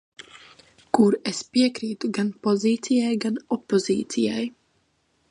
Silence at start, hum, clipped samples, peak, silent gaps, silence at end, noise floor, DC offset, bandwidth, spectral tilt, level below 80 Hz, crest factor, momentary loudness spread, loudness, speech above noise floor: 0.2 s; none; under 0.1%; -4 dBFS; none; 0.8 s; -68 dBFS; under 0.1%; 11 kHz; -5 dB/octave; -68 dBFS; 20 dB; 9 LU; -24 LUFS; 45 dB